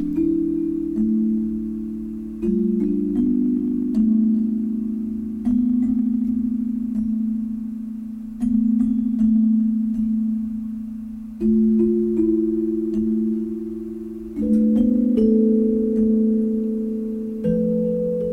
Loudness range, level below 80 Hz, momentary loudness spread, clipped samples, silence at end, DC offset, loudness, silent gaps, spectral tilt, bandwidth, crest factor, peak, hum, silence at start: 3 LU; -44 dBFS; 11 LU; under 0.1%; 0 s; under 0.1%; -21 LUFS; none; -11 dB/octave; 1.7 kHz; 12 dB; -8 dBFS; none; 0 s